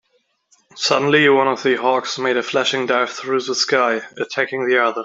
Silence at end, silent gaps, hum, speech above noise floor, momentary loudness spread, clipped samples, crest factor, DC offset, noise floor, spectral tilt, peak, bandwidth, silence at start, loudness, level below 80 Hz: 0 s; none; none; 47 dB; 8 LU; under 0.1%; 16 dB; under 0.1%; -65 dBFS; -3 dB/octave; -2 dBFS; 7.8 kHz; 0.75 s; -18 LUFS; -68 dBFS